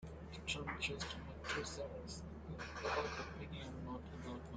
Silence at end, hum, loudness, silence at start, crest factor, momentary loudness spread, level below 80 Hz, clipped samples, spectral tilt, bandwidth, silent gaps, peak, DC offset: 0 s; none; -45 LUFS; 0 s; 18 dB; 9 LU; -56 dBFS; under 0.1%; -4 dB/octave; 9.4 kHz; none; -28 dBFS; under 0.1%